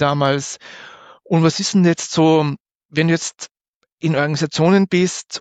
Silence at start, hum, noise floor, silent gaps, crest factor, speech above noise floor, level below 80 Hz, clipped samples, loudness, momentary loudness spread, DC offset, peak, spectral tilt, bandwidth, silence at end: 0 s; none; -65 dBFS; 2.60-2.65 s, 2.75-2.89 s, 3.51-3.55 s, 3.68-3.81 s, 3.92-3.97 s; 14 dB; 49 dB; -60 dBFS; under 0.1%; -17 LUFS; 18 LU; under 0.1%; -4 dBFS; -5.5 dB/octave; 9.2 kHz; 0 s